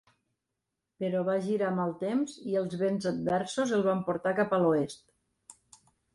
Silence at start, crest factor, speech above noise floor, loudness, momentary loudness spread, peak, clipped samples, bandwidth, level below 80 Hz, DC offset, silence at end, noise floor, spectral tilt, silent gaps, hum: 1 s; 16 dB; 56 dB; -30 LUFS; 6 LU; -14 dBFS; under 0.1%; 11.5 kHz; -70 dBFS; under 0.1%; 0.6 s; -85 dBFS; -6.5 dB/octave; none; none